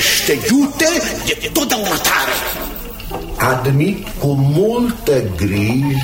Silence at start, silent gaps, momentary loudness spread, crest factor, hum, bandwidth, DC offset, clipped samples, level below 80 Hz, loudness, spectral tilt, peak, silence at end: 0 s; none; 8 LU; 16 dB; none; 17 kHz; under 0.1%; under 0.1%; -34 dBFS; -16 LUFS; -4 dB/octave; 0 dBFS; 0 s